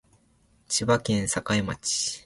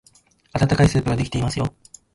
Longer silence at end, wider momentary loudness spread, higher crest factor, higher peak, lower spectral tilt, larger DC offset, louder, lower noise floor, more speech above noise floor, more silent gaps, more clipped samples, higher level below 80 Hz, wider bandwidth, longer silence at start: second, 0.05 s vs 0.45 s; second, 4 LU vs 11 LU; about the same, 20 dB vs 16 dB; about the same, -8 dBFS vs -6 dBFS; second, -3.5 dB/octave vs -6.5 dB/octave; neither; second, -26 LUFS vs -21 LUFS; first, -63 dBFS vs -56 dBFS; about the same, 37 dB vs 37 dB; neither; neither; second, -52 dBFS vs -36 dBFS; about the same, 11.5 kHz vs 11.5 kHz; first, 0.7 s vs 0.55 s